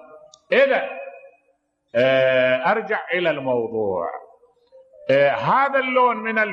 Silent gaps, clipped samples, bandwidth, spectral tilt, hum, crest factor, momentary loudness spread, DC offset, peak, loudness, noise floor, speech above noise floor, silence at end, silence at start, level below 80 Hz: none; under 0.1%; 7 kHz; -6.5 dB/octave; none; 16 dB; 14 LU; under 0.1%; -6 dBFS; -19 LUFS; -67 dBFS; 48 dB; 0 s; 0.15 s; -70 dBFS